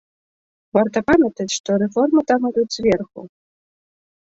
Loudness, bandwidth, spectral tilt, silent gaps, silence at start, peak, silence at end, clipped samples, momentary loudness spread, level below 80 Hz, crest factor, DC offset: -18 LUFS; 8 kHz; -5 dB/octave; 1.60-1.64 s; 0.75 s; -2 dBFS; 1.1 s; under 0.1%; 6 LU; -52 dBFS; 18 dB; under 0.1%